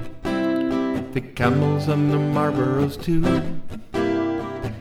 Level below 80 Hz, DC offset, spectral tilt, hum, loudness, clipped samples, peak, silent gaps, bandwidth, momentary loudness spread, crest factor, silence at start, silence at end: -38 dBFS; under 0.1%; -8 dB/octave; none; -22 LUFS; under 0.1%; -6 dBFS; none; 15 kHz; 8 LU; 16 dB; 0 s; 0 s